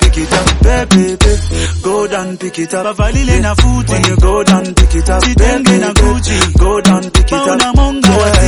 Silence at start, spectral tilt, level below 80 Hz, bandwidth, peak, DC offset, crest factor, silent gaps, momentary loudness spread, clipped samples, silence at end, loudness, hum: 0 s; -5 dB/octave; -12 dBFS; 11.5 kHz; 0 dBFS; under 0.1%; 10 dB; none; 6 LU; 0.3%; 0 s; -11 LUFS; none